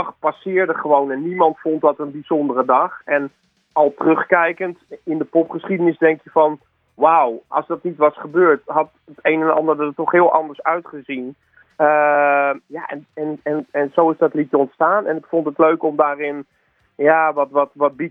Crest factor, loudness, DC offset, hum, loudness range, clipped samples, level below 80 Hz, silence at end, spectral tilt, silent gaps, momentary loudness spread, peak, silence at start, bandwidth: 18 dB; -18 LUFS; under 0.1%; none; 2 LU; under 0.1%; -72 dBFS; 0 s; -9.5 dB/octave; none; 12 LU; 0 dBFS; 0 s; 3.8 kHz